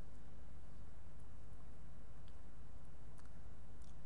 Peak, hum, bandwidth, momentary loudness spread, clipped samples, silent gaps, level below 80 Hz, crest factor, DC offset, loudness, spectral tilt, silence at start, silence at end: -36 dBFS; none; 11 kHz; 1 LU; under 0.1%; none; -60 dBFS; 10 dB; 1%; -61 LUFS; -6.5 dB/octave; 0 s; 0 s